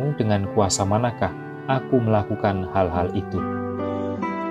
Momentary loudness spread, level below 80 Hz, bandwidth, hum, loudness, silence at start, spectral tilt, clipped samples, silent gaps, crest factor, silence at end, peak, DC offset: 7 LU; -48 dBFS; 13 kHz; none; -23 LUFS; 0 s; -6 dB/octave; under 0.1%; none; 18 dB; 0 s; -6 dBFS; under 0.1%